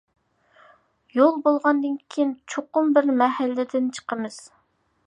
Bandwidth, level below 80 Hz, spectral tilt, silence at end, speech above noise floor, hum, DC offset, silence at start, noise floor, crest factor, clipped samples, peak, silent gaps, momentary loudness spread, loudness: 10.5 kHz; -78 dBFS; -4.5 dB/octave; 0.65 s; 45 dB; none; under 0.1%; 1.15 s; -67 dBFS; 20 dB; under 0.1%; -4 dBFS; none; 12 LU; -22 LUFS